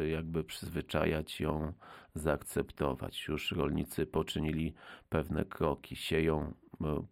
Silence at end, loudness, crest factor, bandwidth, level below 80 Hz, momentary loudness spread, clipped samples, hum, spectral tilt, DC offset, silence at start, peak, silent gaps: 0.05 s; -36 LUFS; 18 dB; 16.5 kHz; -48 dBFS; 7 LU; under 0.1%; none; -6 dB/octave; under 0.1%; 0 s; -18 dBFS; none